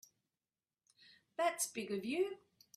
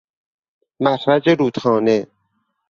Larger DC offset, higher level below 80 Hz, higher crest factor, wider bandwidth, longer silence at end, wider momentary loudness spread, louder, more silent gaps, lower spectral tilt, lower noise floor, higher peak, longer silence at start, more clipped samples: neither; second, -86 dBFS vs -60 dBFS; about the same, 20 dB vs 18 dB; first, 15.5 kHz vs 7.4 kHz; second, 0.4 s vs 0.65 s; first, 12 LU vs 6 LU; second, -39 LUFS vs -17 LUFS; neither; second, -3 dB/octave vs -7 dB/octave; first, under -90 dBFS vs -69 dBFS; second, -24 dBFS vs -2 dBFS; first, 1.4 s vs 0.8 s; neither